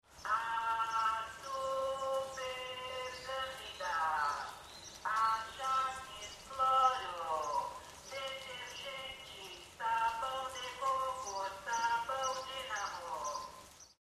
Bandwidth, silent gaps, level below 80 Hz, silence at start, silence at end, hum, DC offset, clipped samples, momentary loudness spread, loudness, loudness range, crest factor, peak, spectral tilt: 15 kHz; none; -68 dBFS; 0.1 s; 0.3 s; none; under 0.1%; under 0.1%; 13 LU; -37 LUFS; 4 LU; 20 dB; -18 dBFS; -1 dB/octave